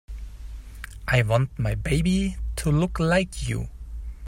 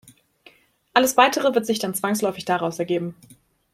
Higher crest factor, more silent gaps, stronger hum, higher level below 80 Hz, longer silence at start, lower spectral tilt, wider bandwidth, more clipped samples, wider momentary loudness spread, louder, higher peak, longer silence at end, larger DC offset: about the same, 18 dB vs 22 dB; neither; neither; first, -34 dBFS vs -66 dBFS; second, 0.1 s vs 0.95 s; first, -6 dB/octave vs -3.5 dB/octave; about the same, 16 kHz vs 16.5 kHz; neither; first, 19 LU vs 9 LU; second, -24 LUFS vs -21 LUFS; second, -8 dBFS vs -2 dBFS; second, 0 s vs 0.6 s; neither